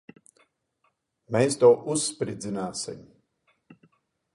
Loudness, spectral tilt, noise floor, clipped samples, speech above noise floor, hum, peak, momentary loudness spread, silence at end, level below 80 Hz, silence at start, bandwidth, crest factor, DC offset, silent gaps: -25 LUFS; -4.5 dB/octave; -73 dBFS; under 0.1%; 49 dB; none; -6 dBFS; 15 LU; 1.35 s; -68 dBFS; 1.3 s; 11.5 kHz; 22 dB; under 0.1%; none